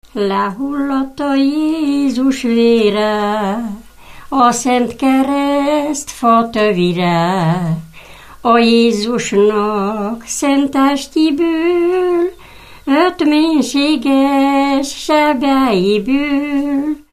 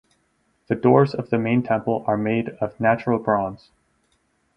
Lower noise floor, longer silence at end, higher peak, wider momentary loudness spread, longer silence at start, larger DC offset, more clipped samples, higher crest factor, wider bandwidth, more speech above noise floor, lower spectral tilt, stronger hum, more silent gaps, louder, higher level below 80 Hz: second, -38 dBFS vs -67 dBFS; second, 0.15 s vs 1 s; about the same, 0 dBFS vs -2 dBFS; about the same, 7 LU vs 7 LU; second, 0.15 s vs 0.7 s; first, 0.4% vs under 0.1%; neither; second, 14 dB vs 20 dB; first, 14.5 kHz vs 5.8 kHz; second, 24 dB vs 46 dB; second, -5 dB/octave vs -9.5 dB/octave; neither; neither; first, -14 LUFS vs -21 LUFS; first, -44 dBFS vs -58 dBFS